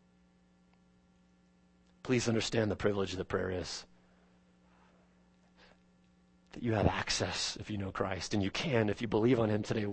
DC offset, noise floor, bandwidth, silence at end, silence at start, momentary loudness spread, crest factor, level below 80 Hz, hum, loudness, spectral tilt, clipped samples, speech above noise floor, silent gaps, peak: under 0.1%; -67 dBFS; 8.4 kHz; 0 s; 2.05 s; 9 LU; 24 dB; -56 dBFS; none; -33 LUFS; -5 dB/octave; under 0.1%; 34 dB; none; -12 dBFS